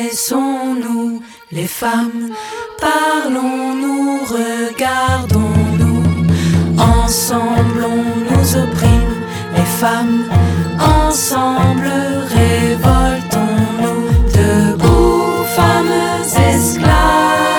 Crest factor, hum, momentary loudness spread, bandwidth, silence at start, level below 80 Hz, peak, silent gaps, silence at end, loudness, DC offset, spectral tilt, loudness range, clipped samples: 12 dB; none; 7 LU; 19.5 kHz; 0 s; -24 dBFS; 0 dBFS; none; 0 s; -14 LUFS; under 0.1%; -5.5 dB/octave; 4 LU; under 0.1%